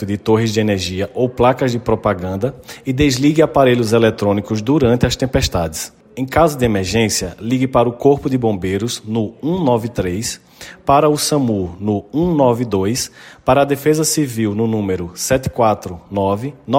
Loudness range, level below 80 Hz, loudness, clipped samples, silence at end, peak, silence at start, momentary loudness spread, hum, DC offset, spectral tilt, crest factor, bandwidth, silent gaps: 3 LU; -38 dBFS; -16 LUFS; under 0.1%; 0 s; 0 dBFS; 0 s; 9 LU; none; under 0.1%; -5.5 dB/octave; 16 dB; 16.5 kHz; none